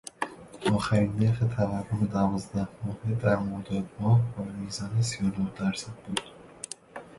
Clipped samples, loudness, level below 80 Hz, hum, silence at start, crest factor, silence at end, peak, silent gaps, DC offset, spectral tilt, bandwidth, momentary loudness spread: under 0.1%; -29 LUFS; -52 dBFS; none; 0.2 s; 20 dB; 0 s; -10 dBFS; none; under 0.1%; -6.5 dB/octave; 11.5 kHz; 12 LU